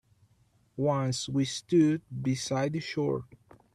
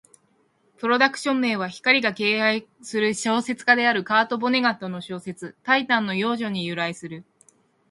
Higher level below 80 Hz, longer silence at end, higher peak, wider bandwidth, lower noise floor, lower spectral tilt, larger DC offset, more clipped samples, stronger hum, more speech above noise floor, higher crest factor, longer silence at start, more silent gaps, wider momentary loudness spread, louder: first, -64 dBFS vs -70 dBFS; second, 0.4 s vs 0.7 s; second, -14 dBFS vs -2 dBFS; about the same, 12.5 kHz vs 11.5 kHz; about the same, -67 dBFS vs -65 dBFS; first, -6 dB/octave vs -4 dB/octave; neither; neither; neither; second, 38 dB vs 42 dB; second, 16 dB vs 22 dB; about the same, 0.75 s vs 0.8 s; neither; second, 7 LU vs 14 LU; second, -29 LUFS vs -22 LUFS